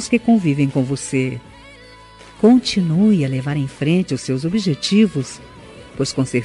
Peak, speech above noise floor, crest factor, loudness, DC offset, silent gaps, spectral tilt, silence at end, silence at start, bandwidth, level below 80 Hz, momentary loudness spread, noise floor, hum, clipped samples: -2 dBFS; 25 dB; 16 dB; -18 LUFS; under 0.1%; none; -6 dB/octave; 0 s; 0 s; 11.5 kHz; -50 dBFS; 10 LU; -42 dBFS; none; under 0.1%